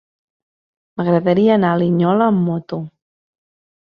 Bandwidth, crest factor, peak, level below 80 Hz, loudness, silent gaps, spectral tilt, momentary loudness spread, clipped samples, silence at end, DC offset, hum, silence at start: 5.2 kHz; 16 dB; -2 dBFS; -60 dBFS; -16 LUFS; none; -10.5 dB/octave; 14 LU; under 0.1%; 1 s; under 0.1%; none; 0.95 s